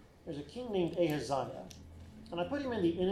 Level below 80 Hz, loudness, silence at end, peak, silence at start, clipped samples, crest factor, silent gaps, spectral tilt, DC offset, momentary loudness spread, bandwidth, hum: -60 dBFS; -36 LUFS; 0 s; -20 dBFS; 0 s; under 0.1%; 16 dB; none; -6.5 dB/octave; under 0.1%; 19 LU; 14.5 kHz; none